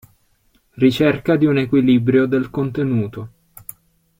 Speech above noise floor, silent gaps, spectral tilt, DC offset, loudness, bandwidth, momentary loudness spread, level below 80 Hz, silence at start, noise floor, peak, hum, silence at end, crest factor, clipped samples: 44 dB; none; -7.5 dB/octave; under 0.1%; -17 LUFS; 16.5 kHz; 22 LU; -52 dBFS; 0.75 s; -60 dBFS; -2 dBFS; none; 0.9 s; 16 dB; under 0.1%